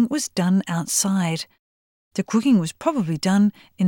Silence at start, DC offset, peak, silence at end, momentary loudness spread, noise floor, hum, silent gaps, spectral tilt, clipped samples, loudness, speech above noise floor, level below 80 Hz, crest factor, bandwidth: 0 s; under 0.1%; -6 dBFS; 0 s; 11 LU; under -90 dBFS; none; 1.59-2.11 s; -5 dB/octave; under 0.1%; -21 LUFS; over 69 dB; -64 dBFS; 16 dB; 18 kHz